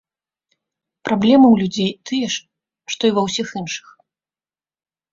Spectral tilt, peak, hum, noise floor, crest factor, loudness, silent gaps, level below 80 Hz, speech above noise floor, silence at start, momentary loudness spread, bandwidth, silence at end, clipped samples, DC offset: -5 dB/octave; -2 dBFS; none; under -90 dBFS; 18 dB; -18 LUFS; none; -58 dBFS; over 73 dB; 1.05 s; 17 LU; 7.6 kHz; 1.35 s; under 0.1%; under 0.1%